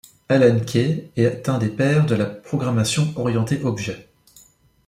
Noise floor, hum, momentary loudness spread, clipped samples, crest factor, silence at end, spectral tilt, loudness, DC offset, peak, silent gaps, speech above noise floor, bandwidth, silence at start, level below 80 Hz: -54 dBFS; none; 8 LU; under 0.1%; 16 dB; 0.85 s; -6 dB/octave; -20 LUFS; under 0.1%; -4 dBFS; none; 34 dB; 15 kHz; 0.3 s; -54 dBFS